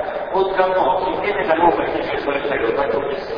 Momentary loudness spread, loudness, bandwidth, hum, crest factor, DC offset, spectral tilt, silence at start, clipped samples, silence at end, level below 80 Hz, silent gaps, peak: 6 LU; -19 LUFS; 5.4 kHz; none; 16 dB; under 0.1%; -7 dB/octave; 0 s; under 0.1%; 0 s; -44 dBFS; none; -2 dBFS